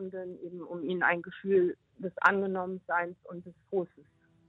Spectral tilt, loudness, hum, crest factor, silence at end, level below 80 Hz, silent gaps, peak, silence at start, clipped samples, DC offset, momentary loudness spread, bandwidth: -7.5 dB/octave; -31 LUFS; none; 24 dB; 0.45 s; -74 dBFS; none; -8 dBFS; 0 s; under 0.1%; under 0.1%; 17 LU; 7.2 kHz